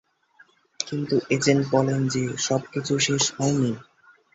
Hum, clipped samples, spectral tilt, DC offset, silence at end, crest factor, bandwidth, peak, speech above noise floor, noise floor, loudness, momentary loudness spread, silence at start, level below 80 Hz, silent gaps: none; under 0.1%; -4.5 dB/octave; under 0.1%; 0.5 s; 22 dB; 8.2 kHz; -2 dBFS; 35 dB; -58 dBFS; -23 LUFS; 8 LU; 0.8 s; -60 dBFS; none